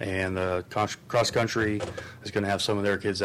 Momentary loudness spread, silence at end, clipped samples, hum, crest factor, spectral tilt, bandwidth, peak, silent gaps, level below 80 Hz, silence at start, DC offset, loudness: 7 LU; 0 s; under 0.1%; none; 12 dB; -4.5 dB/octave; 15.5 kHz; -14 dBFS; none; -56 dBFS; 0 s; under 0.1%; -27 LUFS